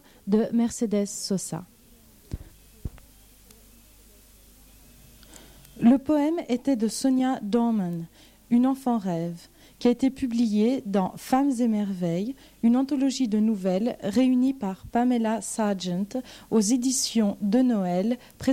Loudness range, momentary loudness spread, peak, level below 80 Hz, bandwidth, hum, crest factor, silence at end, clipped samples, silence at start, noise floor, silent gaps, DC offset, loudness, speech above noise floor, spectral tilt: 5 LU; 12 LU; -10 dBFS; -54 dBFS; 16 kHz; none; 16 dB; 0 s; under 0.1%; 0.25 s; -54 dBFS; none; under 0.1%; -25 LUFS; 30 dB; -5.5 dB/octave